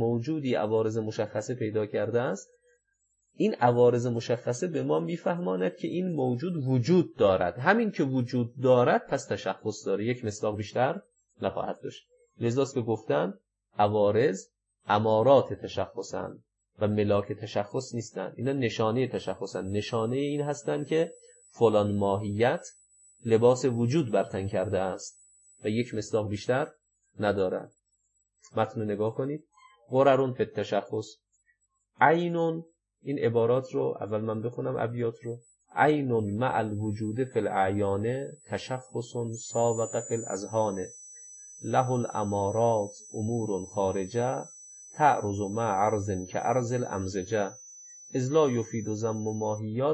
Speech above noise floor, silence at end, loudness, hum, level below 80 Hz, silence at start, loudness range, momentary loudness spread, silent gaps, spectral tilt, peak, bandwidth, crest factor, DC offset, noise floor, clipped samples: 48 dB; 0 s; -28 LUFS; 50 Hz at -55 dBFS; -68 dBFS; 0 s; 5 LU; 12 LU; none; -6 dB/octave; -6 dBFS; 8.6 kHz; 22 dB; under 0.1%; -76 dBFS; under 0.1%